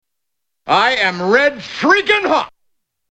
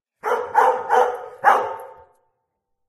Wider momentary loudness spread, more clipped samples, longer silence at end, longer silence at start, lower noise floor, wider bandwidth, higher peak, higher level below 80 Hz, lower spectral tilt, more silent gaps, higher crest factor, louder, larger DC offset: about the same, 7 LU vs 9 LU; neither; second, 0.6 s vs 1 s; first, 0.65 s vs 0.25 s; first, -79 dBFS vs -75 dBFS; second, 9.6 kHz vs 14.5 kHz; about the same, 0 dBFS vs 0 dBFS; first, -56 dBFS vs -70 dBFS; first, -4 dB/octave vs -2.5 dB/octave; neither; second, 16 dB vs 22 dB; first, -14 LUFS vs -19 LUFS; neither